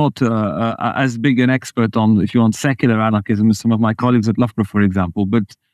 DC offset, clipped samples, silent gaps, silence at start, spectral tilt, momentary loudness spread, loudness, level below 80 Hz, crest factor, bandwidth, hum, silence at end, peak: under 0.1%; under 0.1%; none; 0 s; -7 dB/octave; 4 LU; -16 LUFS; -52 dBFS; 14 dB; 13 kHz; none; 0.3 s; -2 dBFS